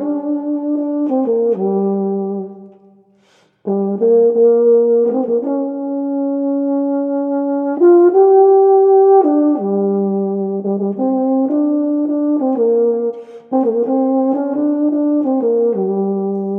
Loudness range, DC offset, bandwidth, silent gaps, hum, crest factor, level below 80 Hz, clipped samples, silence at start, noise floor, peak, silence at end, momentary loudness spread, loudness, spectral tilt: 6 LU; under 0.1%; 1.9 kHz; none; none; 14 dB; -74 dBFS; under 0.1%; 0 s; -54 dBFS; -2 dBFS; 0 s; 10 LU; -15 LUFS; -12.5 dB/octave